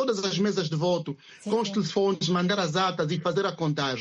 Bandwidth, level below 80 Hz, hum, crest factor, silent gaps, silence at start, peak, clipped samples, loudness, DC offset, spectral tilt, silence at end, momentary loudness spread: 9.8 kHz; -68 dBFS; none; 16 dB; none; 0 s; -12 dBFS; under 0.1%; -26 LUFS; under 0.1%; -5 dB/octave; 0 s; 4 LU